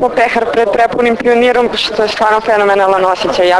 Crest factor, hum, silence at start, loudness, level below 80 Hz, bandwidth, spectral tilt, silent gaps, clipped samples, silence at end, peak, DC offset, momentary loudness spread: 10 dB; none; 0 s; -11 LUFS; -44 dBFS; 11 kHz; -4 dB/octave; none; 0.2%; 0 s; 0 dBFS; under 0.1%; 3 LU